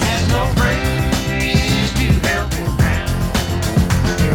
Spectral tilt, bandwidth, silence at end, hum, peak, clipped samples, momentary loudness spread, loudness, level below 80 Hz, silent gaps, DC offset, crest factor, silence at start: -5 dB/octave; 18 kHz; 0 s; none; -2 dBFS; under 0.1%; 3 LU; -17 LUFS; -22 dBFS; none; under 0.1%; 14 dB; 0 s